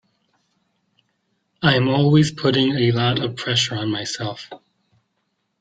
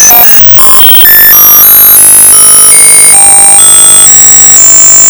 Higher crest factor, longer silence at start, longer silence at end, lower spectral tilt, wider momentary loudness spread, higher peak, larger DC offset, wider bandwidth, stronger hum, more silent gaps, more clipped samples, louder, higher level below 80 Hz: first, 20 dB vs 0 dB; first, 1.6 s vs 0 s; first, 1.05 s vs 0 s; first, -5.5 dB/octave vs 1 dB/octave; first, 12 LU vs 0 LU; about the same, -2 dBFS vs 0 dBFS; neither; second, 9.2 kHz vs over 20 kHz; neither; neither; second, under 0.1% vs 100%; second, -19 LUFS vs 3 LUFS; second, -56 dBFS vs -34 dBFS